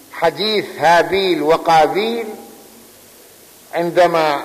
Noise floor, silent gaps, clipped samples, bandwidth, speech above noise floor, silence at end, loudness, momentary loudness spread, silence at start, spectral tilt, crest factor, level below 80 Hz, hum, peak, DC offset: -44 dBFS; none; under 0.1%; 15 kHz; 29 dB; 0 s; -15 LUFS; 12 LU; 0.1 s; -4 dB/octave; 12 dB; -52 dBFS; none; -4 dBFS; under 0.1%